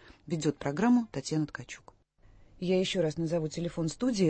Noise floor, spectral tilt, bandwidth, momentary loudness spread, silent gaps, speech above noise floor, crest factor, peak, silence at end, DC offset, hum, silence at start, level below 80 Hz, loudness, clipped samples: -60 dBFS; -6 dB/octave; 8.8 kHz; 12 LU; none; 30 dB; 16 dB; -14 dBFS; 0 s; under 0.1%; none; 0.05 s; -58 dBFS; -31 LUFS; under 0.1%